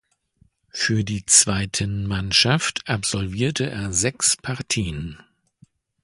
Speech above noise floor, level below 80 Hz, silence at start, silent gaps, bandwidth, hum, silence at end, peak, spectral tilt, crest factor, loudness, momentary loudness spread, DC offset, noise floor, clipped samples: 39 dB; -44 dBFS; 0.75 s; none; 11.5 kHz; none; 0.85 s; 0 dBFS; -2.5 dB/octave; 24 dB; -20 LUFS; 11 LU; under 0.1%; -61 dBFS; under 0.1%